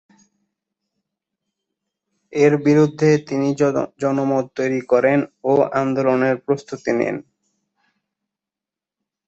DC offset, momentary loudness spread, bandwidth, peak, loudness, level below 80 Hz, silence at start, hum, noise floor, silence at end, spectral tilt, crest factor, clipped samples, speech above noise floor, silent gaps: under 0.1%; 7 LU; 8 kHz; -2 dBFS; -19 LUFS; -64 dBFS; 2.3 s; none; -88 dBFS; 2.05 s; -7 dB/octave; 18 dB; under 0.1%; 70 dB; none